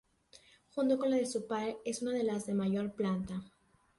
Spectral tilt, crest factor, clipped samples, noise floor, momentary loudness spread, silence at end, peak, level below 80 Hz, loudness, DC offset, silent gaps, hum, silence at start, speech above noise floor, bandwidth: -6 dB/octave; 16 dB; under 0.1%; -63 dBFS; 7 LU; 0.5 s; -20 dBFS; -68 dBFS; -35 LUFS; under 0.1%; none; none; 0.75 s; 29 dB; 11.5 kHz